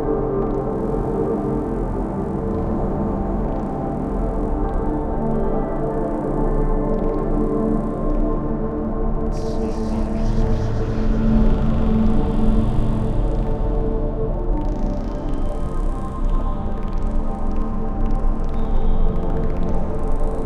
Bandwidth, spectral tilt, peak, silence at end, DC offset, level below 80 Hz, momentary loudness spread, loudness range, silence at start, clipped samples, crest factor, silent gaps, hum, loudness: 6 kHz; -9.5 dB/octave; -4 dBFS; 0 s; under 0.1%; -22 dBFS; 6 LU; 5 LU; 0 s; under 0.1%; 14 dB; none; none; -23 LUFS